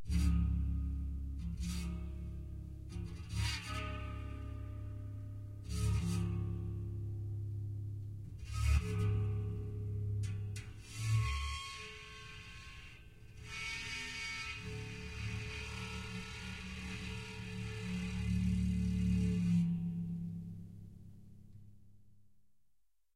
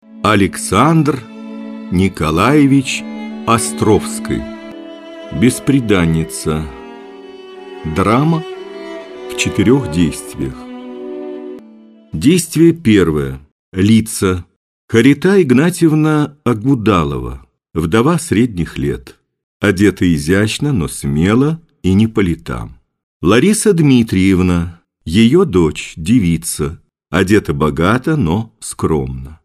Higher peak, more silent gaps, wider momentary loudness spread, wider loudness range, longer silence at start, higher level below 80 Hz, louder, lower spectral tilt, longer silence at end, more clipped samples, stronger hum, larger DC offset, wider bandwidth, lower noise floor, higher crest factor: second, -20 dBFS vs 0 dBFS; second, none vs 13.52-13.72 s, 14.56-14.88 s, 19.43-19.60 s, 23.03-23.20 s; second, 15 LU vs 18 LU; about the same, 7 LU vs 5 LU; second, 0 s vs 0.15 s; second, -44 dBFS vs -36 dBFS; second, -40 LUFS vs -14 LUFS; about the same, -6 dB/octave vs -6 dB/octave; first, 0.7 s vs 0.1 s; neither; neither; neither; second, 13.5 kHz vs 15.5 kHz; first, -77 dBFS vs -41 dBFS; about the same, 18 dB vs 14 dB